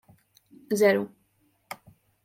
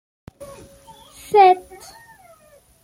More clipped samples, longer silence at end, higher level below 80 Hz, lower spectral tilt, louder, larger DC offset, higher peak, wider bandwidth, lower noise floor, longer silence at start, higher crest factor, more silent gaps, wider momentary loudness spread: neither; second, 0.5 s vs 1.25 s; second, -74 dBFS vs -58 dBFS; about the same, -5 dB/octave vs -4 dB/octave; second, -24 LUFS vs -15 LUFS; neither; second, -8 dBFS vs -2 dBFS; about the same, 16.5 kHz vs 15.5 kHz; first, -69 dBFS vs -53 dBFS; second, 0.7 s vs 1.3 s; about the same, 22 dB vs 20 dB; neither; second, 21 LU vs 28 LU